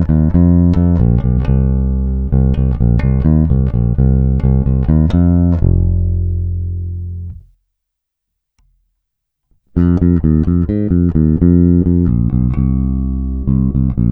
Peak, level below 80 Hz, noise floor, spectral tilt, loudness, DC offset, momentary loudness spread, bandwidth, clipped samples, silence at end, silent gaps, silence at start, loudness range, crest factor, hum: 0 dBFS; -18 dBFS; -76 dBFS; -12.5 dB/octave; -14 LUFS; under 0.1%; 8 LU; 4 kHz; under 0.1%; 0 s; none; 0 s; 9 LU; 12 dB; none